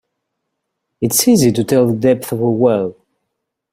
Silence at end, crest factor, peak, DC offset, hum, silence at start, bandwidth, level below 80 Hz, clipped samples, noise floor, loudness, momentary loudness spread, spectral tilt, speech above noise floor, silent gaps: 0.8 s; 16 dB; 0 dBFS; under 0.1%; none; 1 s; 16.5 kHz; -52 dBFS; under 0.1%; -75 dBFS; -14 LUFS; 8 LU; -5 dB/octave; 62 dB; none